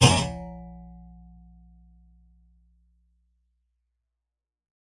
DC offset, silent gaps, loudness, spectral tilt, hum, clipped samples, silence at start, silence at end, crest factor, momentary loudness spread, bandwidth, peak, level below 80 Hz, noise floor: under 0.1%; none; -25 LUFS; -4 dB/octave; none; under 0.1%; 0 s; 4.1 s; 26 dB; 28 LU; 11.5 kHz; -4 dBFS; -48 dBFS; -88 dBFS